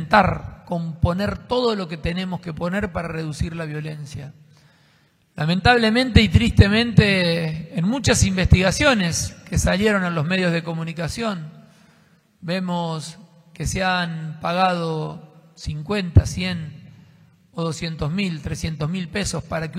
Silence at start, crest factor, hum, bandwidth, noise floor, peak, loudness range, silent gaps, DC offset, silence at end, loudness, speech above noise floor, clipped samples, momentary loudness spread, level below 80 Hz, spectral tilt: 0 s; 20 dB; none; 14.5 kHz; -59 dBFS; 0 dBFS; 10 LU; none; under 0.1%; 0 s; -21 LUFS; 39 dB; under 0.1%; 15 LU; -34 dBFS; -5 dB/octave